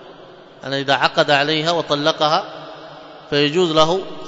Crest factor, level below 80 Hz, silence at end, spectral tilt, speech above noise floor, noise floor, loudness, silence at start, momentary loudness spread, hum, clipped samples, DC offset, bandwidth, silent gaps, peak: 18 dB; -52 dBFS; 0 s; -4.5 dB/octave; 24 dB; -42 dBFS; -17 LUFS; 0 s; 20 LU; none; under 0.1%; under 0.1%; 8 kHz; none; 0 dBFS